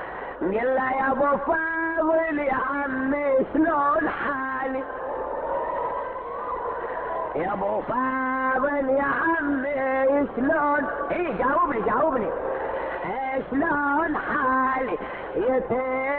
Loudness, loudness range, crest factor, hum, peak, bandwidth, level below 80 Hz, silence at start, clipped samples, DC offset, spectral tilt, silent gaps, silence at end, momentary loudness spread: -25 LUFS; 5 LU; 12 dB; none; -12 dBFS; 4.3 kHz; -52 dBFS; 0 s; under 0.1%; under 0.1%; -10 dB/octave; none; 0 s; 8 LU